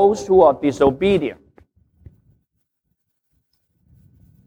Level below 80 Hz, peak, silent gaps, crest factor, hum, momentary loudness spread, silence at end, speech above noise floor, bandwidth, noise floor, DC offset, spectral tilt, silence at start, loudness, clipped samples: -48 dBFS; -2 dBFS; none; 18 dB; none; 7 LU; 3.1 s; 58 dB; 9.4 kHz; -73 dBFS; under 0.1%; -6.5 dB/octave; 0 s; -16 LUFS; under 0.1%